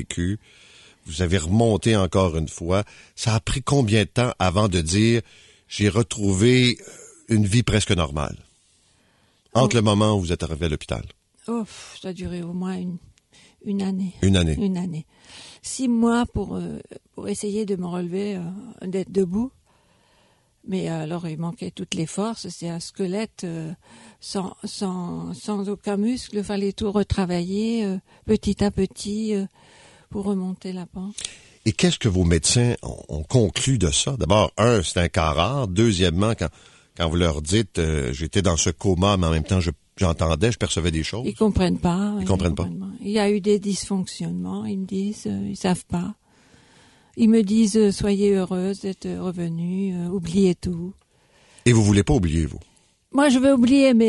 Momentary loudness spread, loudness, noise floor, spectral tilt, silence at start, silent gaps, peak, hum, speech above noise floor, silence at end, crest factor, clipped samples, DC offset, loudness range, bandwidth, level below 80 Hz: 13 LU; -22 LUFS; -62 dBFS; -5.5 dB/octave; 0 s; none; -2 dBFS; none; 40 dB; 0 s; 20 dB; under 0.1%; under 0.1%; 8 LU; 11.5 kHz; -38 dBFS